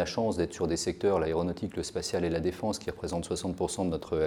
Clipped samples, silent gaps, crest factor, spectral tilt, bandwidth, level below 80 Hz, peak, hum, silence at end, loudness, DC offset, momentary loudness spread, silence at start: under 0.1%; none; 16 dB; -5 dB/octave; 17.5 kHz; -50 dBFS; -14 dBFS; none; 0 s; -31 LUFS; under 0.1%; 6 LU; 0 s